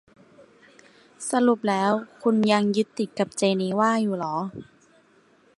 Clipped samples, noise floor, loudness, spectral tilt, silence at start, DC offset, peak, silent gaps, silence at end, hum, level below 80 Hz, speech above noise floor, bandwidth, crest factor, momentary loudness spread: under 0.1%; -59 dBFS; -24 LUFS; -5 dB/octave; 1.2 s; under 0.1%; -6 dBFS; none; 0.95 s; none; -70 dBFS; 36 dB; 11.5 kHz; 20 dB; 9 LU